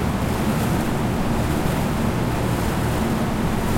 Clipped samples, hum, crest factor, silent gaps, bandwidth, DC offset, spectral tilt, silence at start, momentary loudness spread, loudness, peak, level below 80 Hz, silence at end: under 0.1%; none; 14 dB; none; 16.5 kHz; under 0.1%; -6 dB/octave; 0 s; 1 LU; -22 LUFS; -6 dBFS; -30 dBFS; 0 s